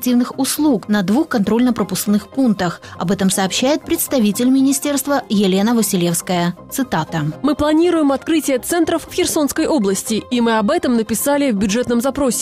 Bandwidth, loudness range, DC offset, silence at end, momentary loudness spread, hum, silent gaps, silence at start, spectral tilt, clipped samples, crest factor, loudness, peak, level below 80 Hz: 16 kHz; 1 LU; under 0.1%; 0 s; 5 LU; none; none; 0 s; -4.5 dB/octave; under 0.1%; 10 dB; -17 LUFS; -6 dBFS; -46 dBFS